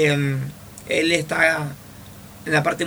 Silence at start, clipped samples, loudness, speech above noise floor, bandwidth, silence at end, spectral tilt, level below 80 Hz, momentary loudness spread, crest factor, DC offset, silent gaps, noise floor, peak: 0 s; under 0.1%; -20 LUFS; 21 dB; over 20 kHz; 0 s; -5 dB/octave; -54 dBFS; 22 LU; 20 dB; under 0.1%; none; -41 dBFS; -2 dBFS